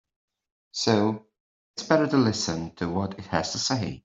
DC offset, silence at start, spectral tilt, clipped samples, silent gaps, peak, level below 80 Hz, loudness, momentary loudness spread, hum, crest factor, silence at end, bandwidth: under 0.1%; 0.75 s; -4.5 dB/octave; under 0.1%; 1.40-1.74 s; -4 dBFS; -60 dBFS; -25 LUFS; 14 LU; none; 22 dB; 0.05 s; 8.2 kHz